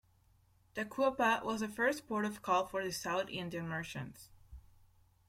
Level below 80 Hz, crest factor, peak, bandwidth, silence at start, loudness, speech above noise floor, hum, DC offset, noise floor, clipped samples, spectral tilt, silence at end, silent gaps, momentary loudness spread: -66 dBFS; 20 dB; -18 dBFS; 16.5 kHz; 0.75 s; -36 LUFS; 33 dB; none; under 0.1%; -69 dBFS; under 0.1%; -4.5 dB/octave; 0.7 s; none; 11 LU